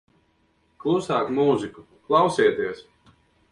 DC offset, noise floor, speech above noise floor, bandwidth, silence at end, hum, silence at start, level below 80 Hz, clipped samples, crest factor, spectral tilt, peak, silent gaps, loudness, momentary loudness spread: under 0.1%; -65 dBFS; 43 dB; 11 kHz; 0.7 s; none; 0.85 s; -62 dBFS; under 0.1%; 18 dB; -6 dB/octave; -6 dBFS; none; -23 LUFS; 11 LU